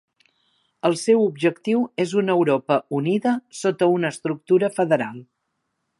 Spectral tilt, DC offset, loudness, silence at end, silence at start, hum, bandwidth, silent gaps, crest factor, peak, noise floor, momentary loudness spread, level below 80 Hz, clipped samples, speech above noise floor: -6 dB/octave; under 0.1%; -21 LUFS; 0.75 s; 0.85 s; none; 11.5 kHz; none; 18 dB; -4 dBFS; -76 dBFS; 6 LU; -74 dBFS; under 0.1%; 55 dB